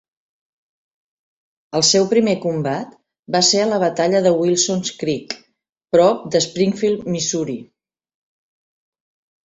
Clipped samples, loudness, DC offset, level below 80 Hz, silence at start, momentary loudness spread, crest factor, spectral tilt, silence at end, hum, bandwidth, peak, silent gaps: under 0.1%; -17 LUFS; under 0.1%; -60 dBFS; 1.75 s; 12 LU; 18 dB; -3.5 dB/octave; 1.8 s; none; 8.4 kHz; -2 dBFS; 3.19-3.23 s, 5.72-5.76 s